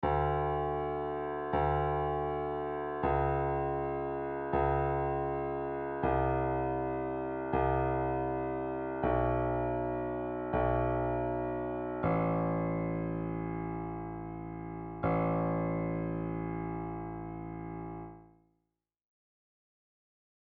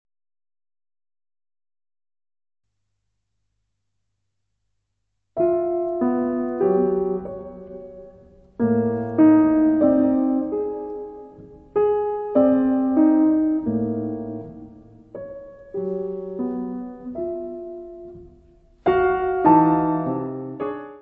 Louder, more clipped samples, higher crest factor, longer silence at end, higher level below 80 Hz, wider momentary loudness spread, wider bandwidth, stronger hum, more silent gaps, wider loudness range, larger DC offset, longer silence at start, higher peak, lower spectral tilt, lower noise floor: second, -34 LUFS vs -21 LUFS; neither; about the same, 16 dB vs 20 dB; first, 2.2 s vs 0 s; first, -46 dBFS vs -54 dBFS; second, 10 LU vs 21 LU; first, 4.4 kHz vs 3.8 kHz; neither; neither; second, 6 LU vs 11 LU; neither; second, 0 s vs 5.35 s; second, -18 dBFS vs -4 dBFS; second, -8 dB/octave vs -11.5 dB/octave; first, -86 dBFS vs -77 dBFS